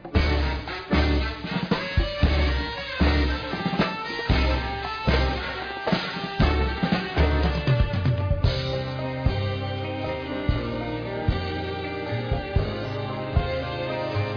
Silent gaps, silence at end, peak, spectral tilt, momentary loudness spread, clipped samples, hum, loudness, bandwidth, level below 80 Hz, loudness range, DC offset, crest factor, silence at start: none; 0 s; -8 dBFS; -7.5 dB/octave; 7 LU; under 0.1%; none; -26 LUFS; 5.4 kHz; -30 dBFS; 4 LU; under 0.1%; 16 dB; 0 s